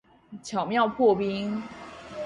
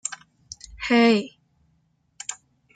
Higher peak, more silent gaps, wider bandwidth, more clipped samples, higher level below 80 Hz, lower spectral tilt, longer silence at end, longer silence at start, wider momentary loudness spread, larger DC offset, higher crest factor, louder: about the same, -10 dBFS vs -8 dBFS; neither; first, 10.5 kHz vs 9.4 kHz; neither; second, -62 dBFS vs -56 dBFS; first, -5.5 dB/octave vs -3.5 dB/octave; second, 0 s vs 0.4 s; first, 0.3 s vs 0.05 s; second, 19 LU vs 25 LU; neither; about the same, 18 dB vs 18 dB; second, -26 LUFS vs -23 LUFS